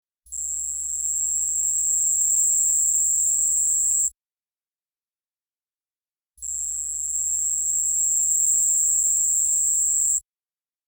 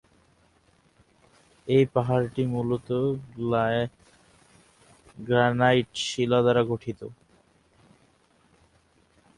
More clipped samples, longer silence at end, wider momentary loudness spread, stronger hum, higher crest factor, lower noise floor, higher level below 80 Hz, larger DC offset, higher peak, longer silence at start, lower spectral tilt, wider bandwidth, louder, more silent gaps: neither; second, 0.7 s vs 2.25 s; second, 8 LU vs 14 LU; neither; second, 12 dB vs 20 dB; first, under -90 dBFS vs -63 dBFS; about the same, -56 dBFS vs -60 dBFS; neither; second, -12 dBFS vs -8 dBFS; second, 0.3 s vs 1.65 s; second, 3 dB/octave vs -6 dB/octave; first, 19 kHz vs 11.5 kHz; first, -19 LUFS vs -25 LUFS; first, 5.49-5.53 s, 6.09-6.13 s vs none